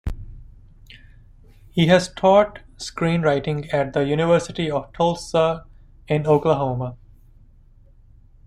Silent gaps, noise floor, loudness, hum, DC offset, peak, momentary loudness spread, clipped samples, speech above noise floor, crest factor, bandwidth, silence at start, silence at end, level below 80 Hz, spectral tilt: none; -50 dBFS; -20 LUFS; none; under 0.1%; -2 dBFS; 14 LU; under 0.1%; 30 dB; 20 dB; 11.5 kHz; 0.05 s; 1.5 s; -42 dBFS; -6 dB/octave